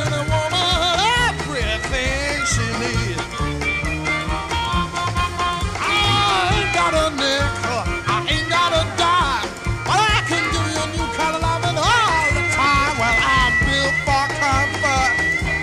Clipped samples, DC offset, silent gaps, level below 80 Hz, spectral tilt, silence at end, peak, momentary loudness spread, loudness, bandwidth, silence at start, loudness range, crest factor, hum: under 0.1%; under 0.1%; none; -30 dBFS; -3.5 dB/octave; 0 s; -4 dBFS; 6 LU; -18 LUFS; 14 kHz; 0 s; 4 LU; 14 dB; none